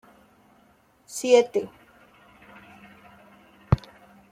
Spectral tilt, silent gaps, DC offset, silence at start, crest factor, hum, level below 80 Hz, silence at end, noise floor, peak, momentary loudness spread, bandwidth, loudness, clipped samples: -5.5 dB/octave; none; under 0.1%; 1.1 s; 24 dB; none; -48 dBFS; 0.55 s; -60 dBFS; -6 dBFS; 26 LU; 15 kHz; -24 LUFS; under 0.1%